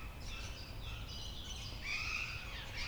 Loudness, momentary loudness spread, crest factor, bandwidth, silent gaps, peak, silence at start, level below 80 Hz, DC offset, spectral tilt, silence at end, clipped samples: -43 LUFS; 9 LU; 16 dB; over 20 kHz; none; -26 dBFS; 0 s; -48 dBFS; under 0.1%; -3 dB/octave; 0 s; under 0.1%